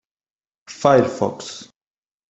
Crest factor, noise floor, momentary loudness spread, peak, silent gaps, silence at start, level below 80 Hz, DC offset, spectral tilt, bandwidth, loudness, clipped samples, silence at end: 22 dB; under -90 dBFS; 21 LU; 0 dBFS; none; 0.7 s; -60 dBFS; under 0.1%; -5.5 dB/octave; 8.2 kHz; -18 LUFS; under 0.1%; 0.65 s